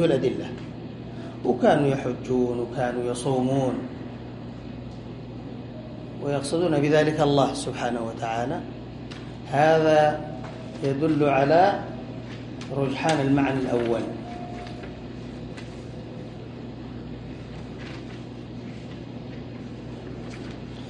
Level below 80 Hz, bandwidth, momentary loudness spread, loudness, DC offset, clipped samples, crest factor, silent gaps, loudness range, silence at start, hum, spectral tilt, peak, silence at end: -50 dBFS; 11.5 kHz; 18 LU; -24 LUFS; under 0.1%; under 0.1%; 20 dB; none; 15 LU; 0 s; 60 Hz at -40 dBFS; -6.5 dB/octave; -6 dBFS; 0 s